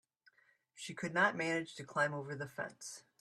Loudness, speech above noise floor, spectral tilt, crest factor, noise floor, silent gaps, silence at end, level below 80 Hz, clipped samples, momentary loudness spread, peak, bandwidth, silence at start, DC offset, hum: -37 LUFS; 33 dB; -4 dB/octave; 22 dB; -71 dBFS; none; 0.2 s; -82 dBFS; under 0.1%; 16 LU; -18 dBFS; 14.5 kHz; 0.75 s; under 0.1%; none